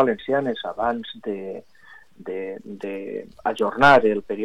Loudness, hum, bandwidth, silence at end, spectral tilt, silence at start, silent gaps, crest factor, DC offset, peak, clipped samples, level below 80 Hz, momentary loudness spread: -22 LUFS; none; 12 kHz; 0 s; -6 dB/octave; 0 s; none; 18 dB; under 0.1%; -4 dBFS; under 0.1%; -56 dBFS; 19 LU